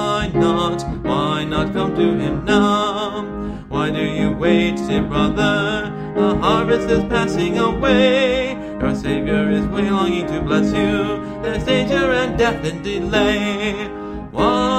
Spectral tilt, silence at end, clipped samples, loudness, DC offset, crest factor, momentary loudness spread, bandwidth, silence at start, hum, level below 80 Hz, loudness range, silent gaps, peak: -6 dB/octave; 0 s; under 0.1%; -18 LUFS; under 0.1%; 16 dB; 8 LU; 10.5 kHz; 0 s; none; -34 dBFS; 2 LU; none; -2 dBFS